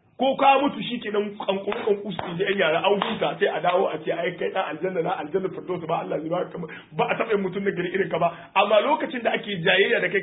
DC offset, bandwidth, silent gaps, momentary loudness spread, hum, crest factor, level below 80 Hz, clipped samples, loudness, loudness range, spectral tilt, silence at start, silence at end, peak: under 0.1%; 4 kHz; none; 9 LU; none; 20 dB; -66 dBFS; under 0.1%; -24 LUFS; 4 LU; -9.5 dB/octave; 0.2 s; 0 s; -4 dBFS